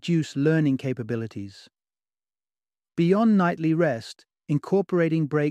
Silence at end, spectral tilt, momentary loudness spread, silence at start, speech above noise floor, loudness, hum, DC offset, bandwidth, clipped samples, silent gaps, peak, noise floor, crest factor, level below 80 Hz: 0 s; -8 dB/octave; 15 LU; 0.05 s; over 67 dB; -24 LUFS; none; under 0.1%; 9.6 kHz; under 0.1%; none; -8 dBFS; under -90 dBFS; 16 dB; -68 dBFS